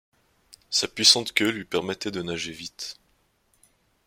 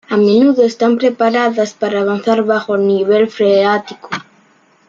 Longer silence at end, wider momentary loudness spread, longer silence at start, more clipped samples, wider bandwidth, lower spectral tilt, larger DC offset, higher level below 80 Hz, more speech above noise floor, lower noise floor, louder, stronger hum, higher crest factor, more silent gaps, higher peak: first, 1.15 s vs 0.65 s; first, 18 LU vs 9 LU; first, 0.7 s vs 0.1 s; neither; first, 16.5 kHz vs 7.6 kHz; second, -1.5 dB/octave vs -6 dB/octave; neither; about the same, -64 dBFS vs -62 dBFS; about the same, 42 dB vs 39 dB; first, -67 dBFS vs -51 dBFS; second, -23 LUFS vs -13 LUFS; neither; first, 26 dB vs 12 dB; neither; about the same, -2 dBFS vs -2 dBFS